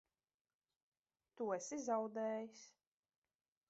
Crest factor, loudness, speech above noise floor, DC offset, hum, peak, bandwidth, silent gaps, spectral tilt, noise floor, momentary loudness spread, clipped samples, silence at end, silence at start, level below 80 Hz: 20 dB; -44 LUFS; over 47 dB; under 0.1%; none; -28 dBFS; 7.6 kHz; none; -4.5 dB/octave; under -90 dBFS; 11 LU; under 0.1%; 1 s; 1.35 s; under -90 dBFS